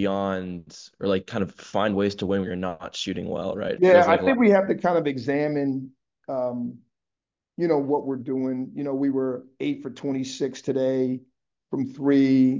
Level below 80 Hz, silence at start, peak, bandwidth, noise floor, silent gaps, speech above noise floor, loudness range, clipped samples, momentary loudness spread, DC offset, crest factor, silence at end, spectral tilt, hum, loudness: -58 dBFS; 0 s; -4 dBFS; 7.6 kHz; -88 dBFS; none; 65 dB; 6 LU; under 0.1%; 14 LU; under 0.1%; 20 dB; 0 s; -6.5 dB/octave; none; -24 LUFS